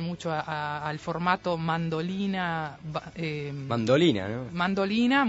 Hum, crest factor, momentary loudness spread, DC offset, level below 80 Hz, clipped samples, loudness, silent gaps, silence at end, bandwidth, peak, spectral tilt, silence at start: none; 18 dB; 11 LU; under 0.1%; -58 dBFS; under 0.1%; -28 LUFS; none; 0 s; 8 kHz; -10 dBFS; -6.5 dB/octave; 0 s